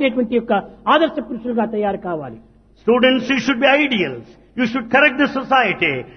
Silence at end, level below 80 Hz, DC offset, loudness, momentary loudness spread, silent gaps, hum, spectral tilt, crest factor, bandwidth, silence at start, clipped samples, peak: 0.05 s; -52 dBFS; under 0.1%; -17 LUFS; 12 LU; none; none; -5 dB/octave; 16 dB; 6.6 kHz; 0 s; under 0.1%; 0 dBFS